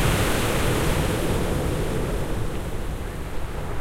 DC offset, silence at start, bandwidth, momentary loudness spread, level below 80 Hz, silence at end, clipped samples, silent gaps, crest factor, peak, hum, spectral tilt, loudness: under 0.1%; 0 s; 16 kHz; 10 LU; -30 dBFS; 0 s; under 0.1%; none; 14 dB; -8 dBFS; none; -5 dB/octave; -26 LUFS